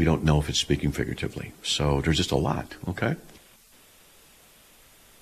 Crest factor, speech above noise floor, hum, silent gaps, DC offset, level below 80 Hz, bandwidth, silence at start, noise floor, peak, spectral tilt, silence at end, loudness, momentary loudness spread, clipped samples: 20 dB; 30 dB; none; none; under 0.1%; -38 dBFS; 14.5 kHz; 0 s; -55 dBFS; -8 dBFS; -5 dB/octave; 1.85 s; -26 LUFS; 10 LU; under 0.1%